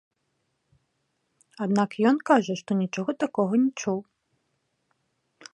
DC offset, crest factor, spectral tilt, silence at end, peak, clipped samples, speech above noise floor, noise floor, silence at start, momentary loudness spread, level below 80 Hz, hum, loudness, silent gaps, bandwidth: under 0.1%; 22 dB; -6 dB/octave; 1.5 s; -6 dBFS; under 0.1%; 51 dB; -76 dBFS; 1.6 s; 8 LU; -78 dBFS; none; -25 LUFS; none; 10.5 kHz